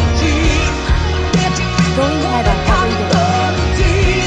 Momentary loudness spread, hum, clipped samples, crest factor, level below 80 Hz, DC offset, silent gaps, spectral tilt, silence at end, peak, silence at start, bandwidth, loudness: 2 LU; none; under 0.1%; 12 dB; -18 dBFS; under 0.1%; none; -5 dB/octave; 0 s; -2 dBFS; 0 s; 9.4 kHz; -14 LUFS